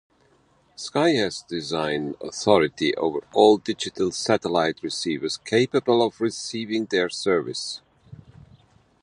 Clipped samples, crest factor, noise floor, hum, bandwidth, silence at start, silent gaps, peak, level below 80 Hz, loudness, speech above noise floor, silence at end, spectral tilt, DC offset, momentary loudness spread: under 0.1%; 20 dB; -61 dBFS; none; 11.5 kHz; 0.8 s; none; -4 dBFS; -60 dBFS; -23 LUFS; 38 dB; 0.85 s; -4 dB/octave; under 0.1%; 10 LU